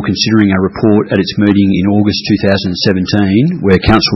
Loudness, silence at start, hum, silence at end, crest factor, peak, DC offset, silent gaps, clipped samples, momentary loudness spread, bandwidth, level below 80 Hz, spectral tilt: -11 LUFS; 0 s; none; 0 s; 10 dB; 0 dBFS; under 0.1%; none; 0.3%; 3 LU; 6 kHz; -34 dBFS; -6.5 dB/octave